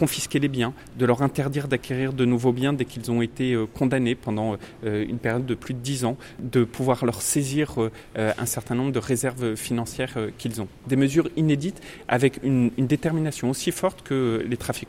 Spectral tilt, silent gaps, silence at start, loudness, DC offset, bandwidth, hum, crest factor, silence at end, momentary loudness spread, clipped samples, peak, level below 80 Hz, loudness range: -5.5 dB/octave; none; 0 s; -25 LUFS; under 0.1%; 16.5 kHz; none; 20 dB; 0 s; 7 LU; under 0.1%; -4 dBFS; -50 dBFS; 2 LU